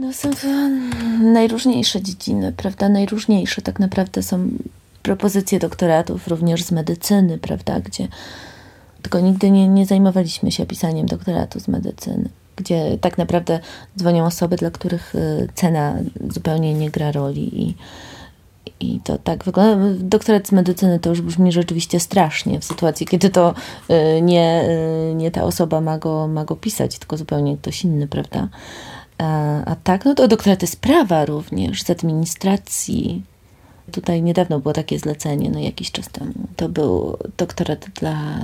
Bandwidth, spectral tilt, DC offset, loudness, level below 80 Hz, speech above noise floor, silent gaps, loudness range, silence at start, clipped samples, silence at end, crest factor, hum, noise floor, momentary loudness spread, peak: 16 kHz; -6 dB/octave; under 0.1%; -18 LUFS; -44 dBFS; 30 dB; none; 5 LU; 0 s; under 0.1%; 0 s; 18 dB; none; -48 dBFS; 11 LU; 0 dBFS